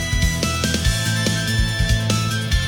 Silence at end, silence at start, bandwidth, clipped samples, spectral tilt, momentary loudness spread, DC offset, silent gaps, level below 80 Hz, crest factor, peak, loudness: 0 s; 0 s; 18 kHz; under 0.1%; -4 dB/octave; 1 LU; under 0.1%; none; -26 dBFS; 14 dB; -6 dBFS; -20 LUFS